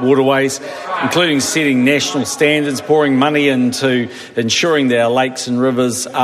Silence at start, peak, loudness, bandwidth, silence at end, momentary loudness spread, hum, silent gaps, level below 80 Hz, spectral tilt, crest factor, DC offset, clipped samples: 0 s; 0 dBFS; -14 LUFS; 14 kHz; 0 s; 7 LU; none; none; -60 dBFS; -4 dB/octave; 14 dB; under 0.1%; under 0.1%